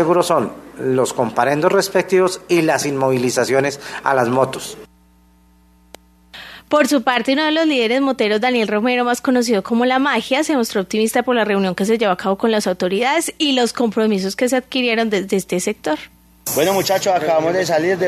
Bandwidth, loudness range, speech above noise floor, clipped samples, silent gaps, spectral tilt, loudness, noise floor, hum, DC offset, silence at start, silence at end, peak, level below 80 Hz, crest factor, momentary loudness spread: 14 kHz; 4 LU; 35 dB; under 0.1%; none; -4 dB/octave; -17 LUFS; -52 dBFS; none; under 0.1%; 0 s; 0 s; 0 dBFS; -56 dBFS; 16 dB; 5 LU